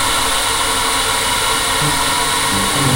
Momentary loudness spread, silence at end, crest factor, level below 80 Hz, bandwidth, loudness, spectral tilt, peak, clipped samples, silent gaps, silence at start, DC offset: 0 LU; 0 s; 14 dB; -32 dBFS; 16 kHz; -14 LUFS; -1.5 dB/octave; -2 dBFS; under 0.1%; none; 0 s; under 0.1%